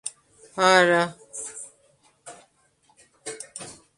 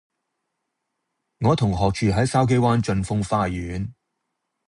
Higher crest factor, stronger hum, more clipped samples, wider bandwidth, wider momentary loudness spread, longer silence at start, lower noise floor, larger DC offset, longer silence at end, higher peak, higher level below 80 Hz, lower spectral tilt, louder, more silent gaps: first, 24 dB vs 18 dB; neither; neither; about the same, 11.5 kHz vs 11 kHz; first, 27 LU vs 10 LU; second, 0.05 s vs 1.4 s; second, -64 dBFS vs -79 dBFS; neither; second, 0.25 s vs 0.75 s; first, -2 dBFS vs -6 dBFS; second, -72 dBFS vs -42 dBFS; second, -3 dB/octave vs -6.5 dB/octave; about the same, -21 LUFS vs -22 LUFS; neither